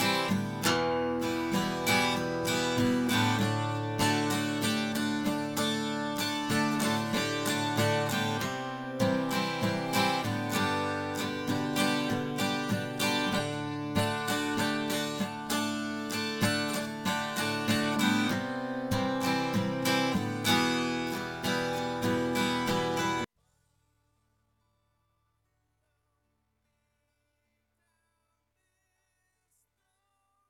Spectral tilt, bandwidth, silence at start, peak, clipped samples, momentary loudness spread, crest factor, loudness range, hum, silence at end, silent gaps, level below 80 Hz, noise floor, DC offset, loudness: -4 dB/octave; 17 kHz; 0 s; -14 dBFS; under 0.1%; 6 LU; 18 dB; 3 LU; none; 7.25 s; none; -60 dBFS; -78 dBFS; under 0.1%; -30 LUFS